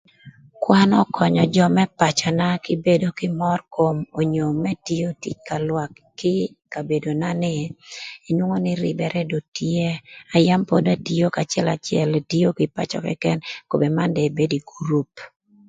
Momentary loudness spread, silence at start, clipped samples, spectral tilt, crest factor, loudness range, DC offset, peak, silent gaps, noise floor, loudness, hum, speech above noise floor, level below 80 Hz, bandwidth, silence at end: 10 LU; 0.25 s; under 0.1%; -6 dB/octave; 20 dB; 6 LU; under 0.1%; 0 dBFS; 9.48-9.52 s; -47 dBFS; -21 LUFS; none; 26 dB; -58 dBFS; 9.2 kHz; 0.4 s